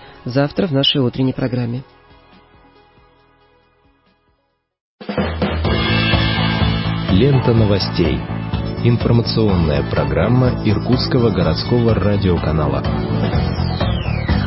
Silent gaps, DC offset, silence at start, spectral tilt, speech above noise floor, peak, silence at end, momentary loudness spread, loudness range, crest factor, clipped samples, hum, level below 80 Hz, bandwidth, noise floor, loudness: 4.81-4.99 s; under 0.1%; 0 s; -10.5 dB/octave; 50 dB; -2 dBFS; 0 s; 7 LU; 10 LU; 16 dB; under 0.1%; none; -28 dBFS; 5.8 kHz; -66 dBFS; -17 LUFS